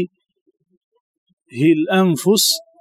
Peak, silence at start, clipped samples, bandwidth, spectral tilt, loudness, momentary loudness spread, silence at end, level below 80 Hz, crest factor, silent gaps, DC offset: -4 dBFS; 0 s; under 0.1%; 16.5 kHz; -4 dB/octave; -16 LUFS; 11 LU; 0.2 s; -76 dBFS; 16 dB; 0.41-0.46 s, 0.77-0.92 s, 1.00-1.26 s, 1.33-1.37 s; under 0.1%